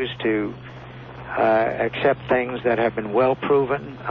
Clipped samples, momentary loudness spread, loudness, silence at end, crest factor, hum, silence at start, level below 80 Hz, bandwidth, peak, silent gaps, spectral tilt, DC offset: under 0.1%; 19 LU; -22 LUFS; 0 s; 14 dB; none; 0 s; -52 dBFS; 5.6 kHz; -8 dBFS; none; -8.5 dB/octave; under 0.1%